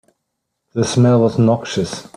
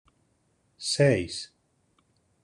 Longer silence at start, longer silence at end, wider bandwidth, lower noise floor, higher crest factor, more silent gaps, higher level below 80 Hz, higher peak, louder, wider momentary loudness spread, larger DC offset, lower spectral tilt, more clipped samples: about the same, 0.75 s vs 0.8 s; second, 0.15 s vs 1 s; about the same, 11 kHz vs 11 kHz; first, -75 dBFS vs -70 dBFS; second, 14 dB vs 20 dB; neither; first, -52 dBFS vs -62 dBFS; first, -2 dBFS vs -10 dBFS; first, -16 LUFS vs -26 LUFS; second, 9 LU vs 15 LU; neither; first, -6.5 dB/octave vs -4.5 dB/octave; neither